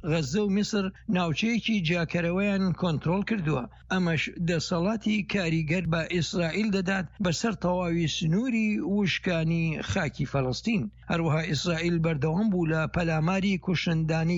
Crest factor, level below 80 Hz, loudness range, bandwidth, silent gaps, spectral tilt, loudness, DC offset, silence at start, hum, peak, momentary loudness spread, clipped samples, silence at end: 14 dB; -48 dBFS; 1 LU; 8 kHz; none; -6 dB/octave; -27 LUFS; under 0.1%; 0.05 s; none; -12 dBFS; 3 LU; under 0.1%; 0 s